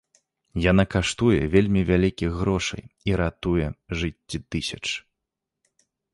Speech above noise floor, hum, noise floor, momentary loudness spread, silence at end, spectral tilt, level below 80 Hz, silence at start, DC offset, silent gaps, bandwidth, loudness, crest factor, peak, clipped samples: 61 dB; none; -84 dBFS; 10 LU; 1.15 s; -6 dB/octave; -38 dBFS; 0.55 s; under 0.1%; none; 11.5 kHz; -24 LUFS; 20 dB; -6 dBFS; under 0.1%